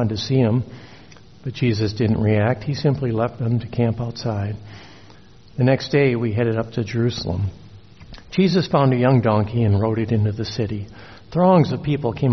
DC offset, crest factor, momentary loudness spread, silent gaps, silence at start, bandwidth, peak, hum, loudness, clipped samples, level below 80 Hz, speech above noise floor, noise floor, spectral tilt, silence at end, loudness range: 0.4%; 16 dB; 11 LU; none; 0 s; 6.4 kHz; -4 dBFS; none; -20 LUFS; under 0.1%; -48 dBFS; 28 dB; -47 dBFS; -7 dB/octave; 0 s; 3 LU